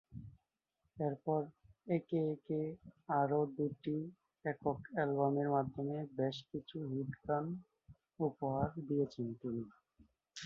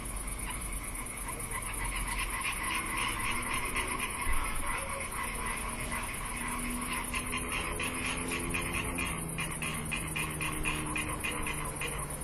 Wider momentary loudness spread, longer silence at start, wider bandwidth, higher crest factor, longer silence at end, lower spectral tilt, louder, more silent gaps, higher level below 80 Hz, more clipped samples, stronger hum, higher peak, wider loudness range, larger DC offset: first, 14 LU vs 4 LU; about the same, 0.1 s vs 0 s; second, 6.4 kHz vs 13 kHz; about the same, 20 dB vs 16 dB; about the same, 0 s vs 0 s; first, -7 dB/octave vs -2.5 dB/octave; second, -39 LUFS vs -34 LUFS; neither; second, -68 dBFS vs -42 dBFS; neither; neither; about the same, -20 dBFS vs -18 dBFS; about the same, 3 LU vs 2 LU; neither